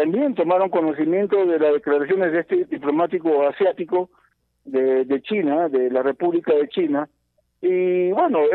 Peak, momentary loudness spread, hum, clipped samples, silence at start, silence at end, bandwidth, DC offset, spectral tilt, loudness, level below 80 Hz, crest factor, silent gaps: -8 dBFS; 5 LU; none; under 0.1%; 0 s; 0 s; 4.2 kHz; under 0.1%; -9.5 dB/octave; -20 LUFS; -72 dBFS; 12 dB; none